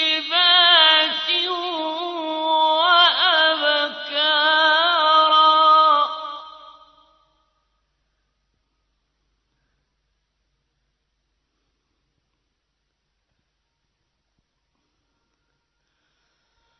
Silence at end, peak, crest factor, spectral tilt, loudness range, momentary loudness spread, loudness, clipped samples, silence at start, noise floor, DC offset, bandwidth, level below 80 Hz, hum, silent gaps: 10.1 s; -2 dBFS; 20 dB; -0.5 dB/octave; 5 LU; 13 LU; -16 LUFS; under 0.1%; 0 s; -75 dBFS; under 0.1%; 6.4 kHz; -74 dBFS; none; none